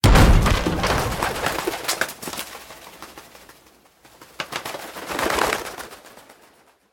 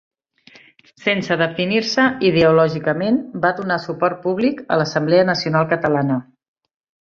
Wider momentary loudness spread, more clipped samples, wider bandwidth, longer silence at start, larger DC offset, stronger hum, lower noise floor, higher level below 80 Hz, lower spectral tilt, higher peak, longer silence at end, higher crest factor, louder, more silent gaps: first, 22 LU vs 6 LU; neither; first, 17.5 kHz vs 7.4 kHz; second, 0.05 s vs 1 s; neither; neither; first, -55 dBFS vs -49 dBFS; first, -26 dBFS vs -56 dBFS; second, -4.5 dB/octave vs -6 dB/octave; about the same, -2 dBFS vs -2 dBFS; about the same, 0.7 s vs 0.8 s; first, 22 dB vs 16 dB; second, -22 LUFS vs -18 LUFS; neither